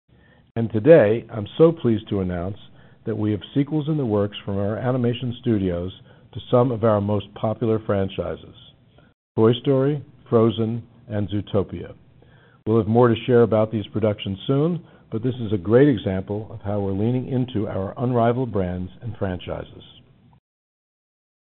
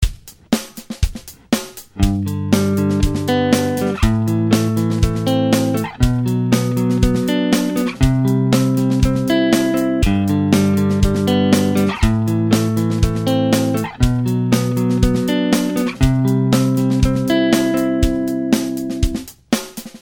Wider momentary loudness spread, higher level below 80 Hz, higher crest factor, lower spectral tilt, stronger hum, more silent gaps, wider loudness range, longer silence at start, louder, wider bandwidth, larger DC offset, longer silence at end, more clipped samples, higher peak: first, 15 LU vs 7 LU; second, -54 dBFS vs -26 dBFS; first, 22 dB vs 16 dB; about the same, -7 dB/octave vs -6 dB/octave; neither; first, 9.14-9.35 s vs none; about the same, 4 LU vs 2 LU; first, 0.55 s vs 0 s; second, -22 LUFS vs -17 LUFS; second, 4.2 kHz vs 18 kHz; neither; first, 1.6 s vs 0.05 s; neither; about the same, 0 dBFS vs 0 dBFS